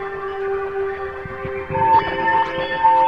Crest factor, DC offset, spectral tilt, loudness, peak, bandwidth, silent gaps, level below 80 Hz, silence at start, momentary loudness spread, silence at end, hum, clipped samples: 14 dB; under 0.1%; -6.5 dB/octave; -20 LUFS; -4 dBFS; 6.2 kHz; none; -46 dBFS; 0 s; 12 LU; 0 s; none; under 0.1%